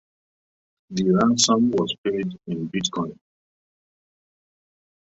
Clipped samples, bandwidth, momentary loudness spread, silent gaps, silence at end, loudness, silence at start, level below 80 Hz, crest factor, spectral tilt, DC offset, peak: under 0.1%; 8.2 kHz; 13 LU; 1.98-2.04 s; 2 s; -22 LUFS; 0.9 s; -60 dBFS; 20 dB; -4.5 dB/octave; under 0.1%; -4 dBFS